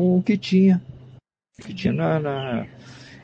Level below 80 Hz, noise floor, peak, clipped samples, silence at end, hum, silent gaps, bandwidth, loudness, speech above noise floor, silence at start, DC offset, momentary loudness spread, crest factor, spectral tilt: -56 dBFS; -50 dBFS; -8 dBFS; under 0.1%; 0.1 s; none; none; 7.4 kHz; -21 LUFS; 29 dB; 0 s; under 0.1%; 21 LU; 14 dB; -8 dB/octave